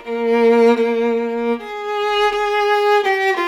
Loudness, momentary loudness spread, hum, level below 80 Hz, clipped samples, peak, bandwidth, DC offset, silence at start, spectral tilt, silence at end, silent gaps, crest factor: -16 LUFS; 8 LU; none; -52 dBFS; under 0.1%; -4 dBFS; 13.5 kHz; under 0.1%; 0 s; -4 dB/octave; 0 s; none; 12 dB